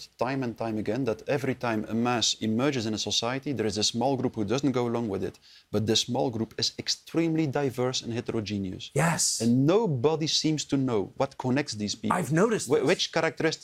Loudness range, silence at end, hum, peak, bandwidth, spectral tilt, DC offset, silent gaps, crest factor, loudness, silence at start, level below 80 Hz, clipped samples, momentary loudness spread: 2 LU; 0.05 s; none; -10 dBFS; 16 kHz; -4.5 dB/octave; under 0.1%; none; 18 dB; -27 LUFS; 0 s; -64 dBFS; under 0.1%; 7 LU